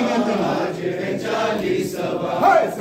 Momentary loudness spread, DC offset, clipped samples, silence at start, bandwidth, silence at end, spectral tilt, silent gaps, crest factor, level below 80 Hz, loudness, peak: 8 LU; under 0.1%; under 0.1%; 0 s; 16 kHz; 0 s; -5.5 dB/octave; none; 16 dB; -56 dBFS; -21 LUFS; -4 dBFS